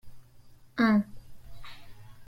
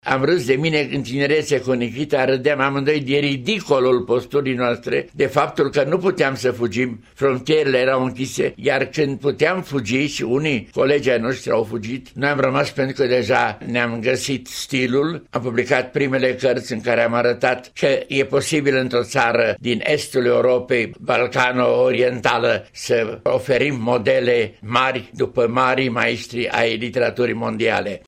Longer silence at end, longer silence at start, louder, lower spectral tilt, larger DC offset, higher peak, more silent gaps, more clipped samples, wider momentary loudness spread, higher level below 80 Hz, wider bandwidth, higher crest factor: about the same, 0.05 s vs 0.1 s; about the same, 0.05 s vs 0.05 s; second, -27 LUFS vs -19 LUFS; first, -7 dB/octave vs -5 dB/octave; neither; second, -12 dBFS vs -2 dBFS; neither; neither; first, 25 LU vs 5 LU; about the same, -56 dBFS vs -54 dBFS; second, 13 kHz vs 15.5 kHz; about the same, 20 dB vs 16 dB